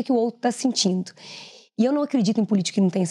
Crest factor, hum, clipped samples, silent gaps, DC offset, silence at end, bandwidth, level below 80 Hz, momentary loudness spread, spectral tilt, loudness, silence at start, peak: 14 dB; none; under 0.1%; none; under 0.1%; 0 s; 11.5 kHz; -84 dBFS; 17 LU; -5 dB/octave; -22 LUFS; 0 s; -8 dBFS